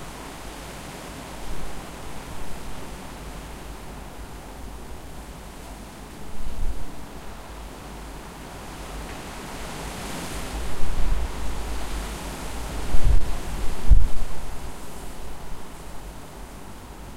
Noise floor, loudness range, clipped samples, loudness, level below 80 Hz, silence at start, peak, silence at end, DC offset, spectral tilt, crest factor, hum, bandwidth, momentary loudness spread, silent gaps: -39 dBFS; 10 LU; under 0.1%; -34 LUFS; -28 dBFS; 0 s; -2 dBFS; 0 s; under 0.1%; -4.5 dB/octave; 18 dB; none; 14.5 kHz; 12 LU; none